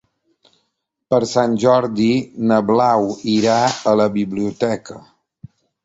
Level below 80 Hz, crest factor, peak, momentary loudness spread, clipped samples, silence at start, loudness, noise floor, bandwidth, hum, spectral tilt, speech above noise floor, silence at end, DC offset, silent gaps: -56 dBFS; 16 dB; -2 dBFS; 7 LU; under 0.1%; 1.1 s; -17 LUFS; -73 dBFS; 8 kHz; none; -5.5 dB/octave; 56 dB; 0.85 s; under 0.1%; none